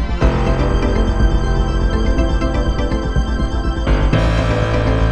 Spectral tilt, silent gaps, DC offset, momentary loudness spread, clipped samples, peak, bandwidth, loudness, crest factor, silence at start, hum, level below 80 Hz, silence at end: -7 dB/octave; none; under 0.1%; 4 LU; under 0.1%; -2 dBFS; 8.4 kHz; -17 LUFS; 14 dB; 0 s; none; -16 dBFS; 0 s